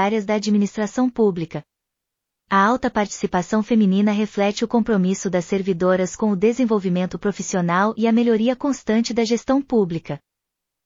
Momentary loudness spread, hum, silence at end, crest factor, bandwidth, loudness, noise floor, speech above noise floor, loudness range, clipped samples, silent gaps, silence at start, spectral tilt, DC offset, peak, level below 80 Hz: 6 LU; none; 0.7 s; 16 dB; 7.6 kHz; -20 LUFS; -82 dBFS; 63 dB; 2 LU; under 0.1%; none; 0 s; -6 dB/octave; under 0.1%; -4 dBFS; -54 dBFS